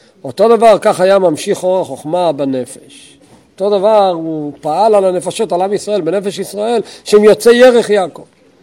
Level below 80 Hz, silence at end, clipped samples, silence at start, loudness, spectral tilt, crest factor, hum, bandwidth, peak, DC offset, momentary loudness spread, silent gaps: -56 dBFS; 0.4 s; 1%; 0.25 s; -12 LUFS; -5 dB/octave; 12 dB; none; 16.5 kHz; 0 dBFS; under 0.1%; 12 LU; none